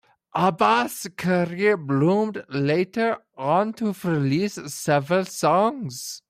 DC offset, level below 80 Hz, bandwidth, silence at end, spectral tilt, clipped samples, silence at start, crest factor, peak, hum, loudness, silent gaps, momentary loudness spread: under 0.1%; -66 dBFS; 16 kHz; 0.1 s; -5.5 dB/octave; under 0.1%; 0.35 s; 16 dB; -6 dBFS; none; -23 LUFS; none; 8 LU